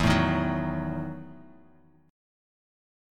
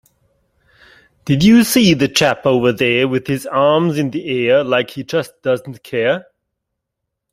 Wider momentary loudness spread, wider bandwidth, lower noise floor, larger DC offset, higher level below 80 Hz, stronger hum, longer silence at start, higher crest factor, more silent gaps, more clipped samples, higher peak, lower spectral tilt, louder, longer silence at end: first, 19 LU vs 10 LU; second, 13.5 kHz vs 16 kHz; second, -59 dBFS vs -78 dBFS; neither; first, -44 dBFS vs -50 dBFS; neither; second, 0 s vs 1.25 s; first, 22 dB vs 16 dB; neither; neither; second, -8 dBFS vs 0 dBFS; first, -6.5 dB/octave vs -5 dB/octave; second, -28 LUFS vs -15 LUFS; about the same, 1 s vs 1.1 s